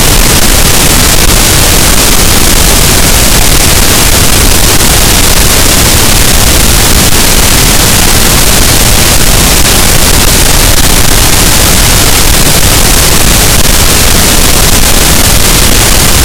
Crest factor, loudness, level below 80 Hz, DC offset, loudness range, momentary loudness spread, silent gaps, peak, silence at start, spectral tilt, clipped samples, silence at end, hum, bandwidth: 4 dB; -3 LUFS; -10 dBFS; under 0.1%; 0 LU; 1 LU; none; 0 dBFS; 0 s; -2.5 dB/octave; 20%; 0 s; none; over 20 kHz